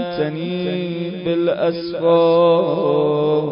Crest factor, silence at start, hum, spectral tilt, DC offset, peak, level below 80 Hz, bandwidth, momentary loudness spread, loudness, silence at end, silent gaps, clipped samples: 12 dB; 0 s; none; -11.5 dB/octave; under 0.1%; -6 dBFS; -60 dBFS; 5.4 kHz; 9 LU; -18 LUFS; 0 s; none; under 0.1%